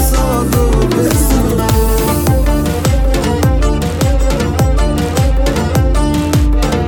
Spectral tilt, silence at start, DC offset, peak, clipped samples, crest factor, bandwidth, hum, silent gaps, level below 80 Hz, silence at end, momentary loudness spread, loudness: -6 dB/octave; 0 s; under 0.1%; 0 dBFS; under 0.1%; 12 dB; 19.5 kHz; none; none; -14 dBFS; 0 s; 2 LU; -13 LUFS